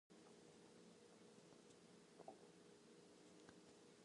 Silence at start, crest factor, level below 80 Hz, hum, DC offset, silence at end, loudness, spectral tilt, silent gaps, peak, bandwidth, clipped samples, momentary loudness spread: 0.1 s; 24 dB; under -90 dBFS; none; under 0.1%; 0 s; -66 LUFS; -4 dB/octave; none; -44 dBFS; 11 kHz; under 0.1%; 4 LU